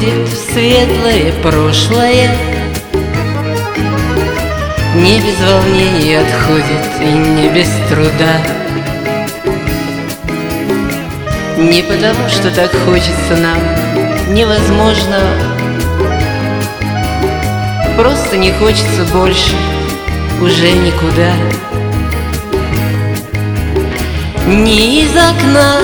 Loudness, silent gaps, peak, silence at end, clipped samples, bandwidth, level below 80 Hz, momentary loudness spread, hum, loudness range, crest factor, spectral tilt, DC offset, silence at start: -11 LUFS; none; 0 dBFS; 0 s; 0.5%; 19.5 kHz; -22 dBFS; 8 LU; none; 4 LU; 10 dB; -5 dB/octave; under 0.1%; 0 s